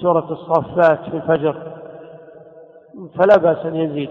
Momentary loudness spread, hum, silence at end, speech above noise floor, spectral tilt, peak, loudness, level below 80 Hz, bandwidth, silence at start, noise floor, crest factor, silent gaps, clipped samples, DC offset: 23 LU; none; 0 s; 27 dB; -8.5 dB/octave; -2 dBFS; -17 LUFS; -56 dBFS; 6.2 kHz; 0 s; -43 dBFS; 16 dB; none; under 0.1%; under 0.1%